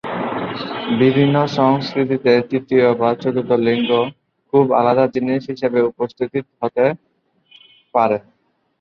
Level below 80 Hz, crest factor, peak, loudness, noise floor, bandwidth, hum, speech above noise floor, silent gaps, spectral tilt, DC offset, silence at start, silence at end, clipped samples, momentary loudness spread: -60 dBFS; 16 dB; -2 dBFS; -17 LUFS; -57 dBFS; 6.8 kHz; none; 41 dB; none; -8 dB/octave; under 0.1%; 0.05 s; 0.6 s; under 0.1%; 9 LU